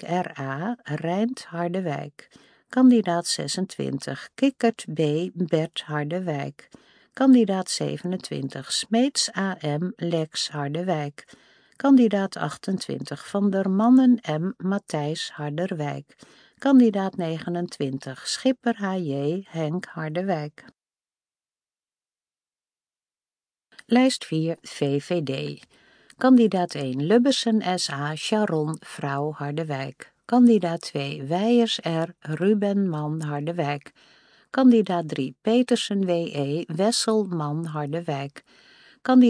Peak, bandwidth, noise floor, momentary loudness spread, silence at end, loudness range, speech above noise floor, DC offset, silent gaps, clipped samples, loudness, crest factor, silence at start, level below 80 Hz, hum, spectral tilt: -6 dBFS; 10.5 kHz; under -90 dBFS; 12 LU; 0 s; 5 LU; over 67 dB; under 0.1%; none; under 0.1%; -24 LUFS; 18 dB; 0 s; -76 dBFS; none; -5.5 dB/octave